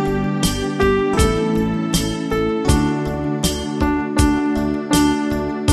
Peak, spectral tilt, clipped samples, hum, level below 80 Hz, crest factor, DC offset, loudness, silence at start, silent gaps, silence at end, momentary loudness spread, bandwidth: -2 dBFS; -5 dB/octave; under 0.1%; none; -28 dBFS; 16 dB; under 0.1%; -19 LUFS; 0 s; none; 0 s; 4 LU; 15.5 kHz